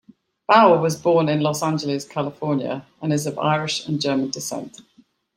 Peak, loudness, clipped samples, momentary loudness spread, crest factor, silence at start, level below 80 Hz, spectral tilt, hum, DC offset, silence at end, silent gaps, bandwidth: -2 dBFS; -20 LUFS; under 0.1%; 14 LU; 20 dB; 0.5 s; -66 dBFS; -5 dB/octave; none; under 0.1%; 0.55 s; none; 16 kHz